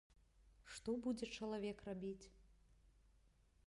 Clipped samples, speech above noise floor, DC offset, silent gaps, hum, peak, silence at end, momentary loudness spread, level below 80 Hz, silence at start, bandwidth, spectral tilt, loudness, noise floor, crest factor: under 0.1%; 27 dB; under 0.1%; none; none; -34 dBFS; 0.75 s; 14 LU; -70 dBFS; 0.1 s; 11.5 kHz; -5 dB/octave; -47 LUFS; -74 dBFS; 16 dB